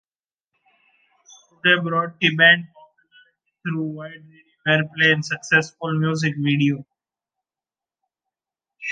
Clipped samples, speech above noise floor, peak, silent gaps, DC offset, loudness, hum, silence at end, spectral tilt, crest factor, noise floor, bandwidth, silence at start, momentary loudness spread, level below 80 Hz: under 0.1%; over 70 dB; -2 dBFS; none; under 0.1%; -19 LUFS; none; 0 s; -5 dB/octave; 22 dB; under -90 dBFS; 9.2 kHz; 1.65 s; 16 LU; -70 dBFS